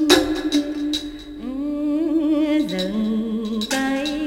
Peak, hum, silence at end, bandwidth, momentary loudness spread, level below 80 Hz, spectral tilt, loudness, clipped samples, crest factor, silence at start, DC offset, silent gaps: 0 dBFS; none; 0 s; 17 kHz; 8 LU; -46 dBFS; -4 dB/octave; -22 LUFS; under 0.1%; 20 dB; 0 s; under 0.1%; none